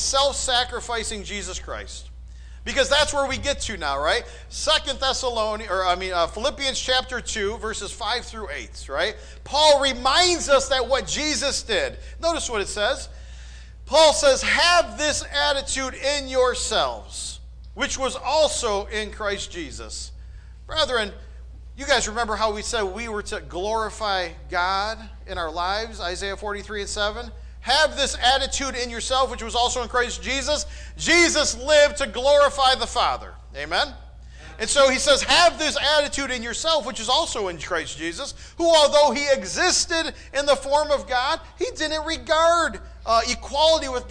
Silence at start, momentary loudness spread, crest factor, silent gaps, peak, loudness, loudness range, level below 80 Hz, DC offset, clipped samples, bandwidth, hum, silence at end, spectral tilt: 0 s; 14 LU; 16 dB; none; -6 dBFS; -22 LUFS; 6 LU; -40 dBFS; under 0.1%; under 0.1%; 10.5 kHz; none; 0 s; -2 dB/octave